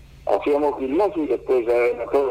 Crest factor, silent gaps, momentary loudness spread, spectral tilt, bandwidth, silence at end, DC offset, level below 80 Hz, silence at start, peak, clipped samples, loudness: 14 dB; none; 4 LU; -6.5 dB/octave; 14 kHz; 0 s; under 0.1%; -50 dBFS; 0.15 s; -8 dBFS; under 0.1%; -21 LUFS